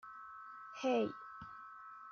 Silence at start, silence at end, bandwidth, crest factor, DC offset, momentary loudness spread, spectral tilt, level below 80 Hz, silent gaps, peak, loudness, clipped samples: 0.05 s; 0 s; 6.8 kHz; 18 dB; under 0.1%; 16 LU; -3.5 dB/octave; -80 dBFS; none; -24 dBFS; -41 LUFS; under 0.1%